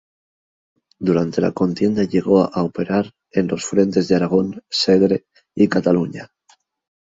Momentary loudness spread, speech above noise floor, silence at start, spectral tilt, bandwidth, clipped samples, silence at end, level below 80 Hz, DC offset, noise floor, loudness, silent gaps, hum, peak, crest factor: 7 LU; 40 dB; 1 s; -6 dB/octave; 7.8 kHz; under 0.1%; 0.75 s; -54 dBFS; under 0.1%; -58 dBFS; -18 LUFS; none; none; -2 dBFS; 16 dB